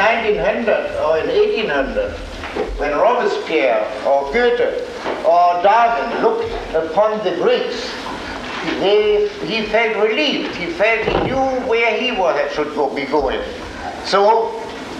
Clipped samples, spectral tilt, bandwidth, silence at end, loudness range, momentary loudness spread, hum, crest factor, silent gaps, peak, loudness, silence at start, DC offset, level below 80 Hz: under 0.1%; -4.5 dB/octave; 10.5 kHz; 0 s; 2 LU; 10 LU; none; 14 dB; none; -2 dBFS; -17 LUFS; 0 s; under 0.1%; -40 dBFS